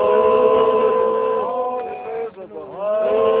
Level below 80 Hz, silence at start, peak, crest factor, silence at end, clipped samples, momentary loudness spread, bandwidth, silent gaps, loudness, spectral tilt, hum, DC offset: -54 dBFS; 0 s; -4 dBFS; 14 dB; 0 s; under 0.1%; 14 LU; 4 kHz; none; -18 LUFS; -9 dB/octave; none; under 0.1%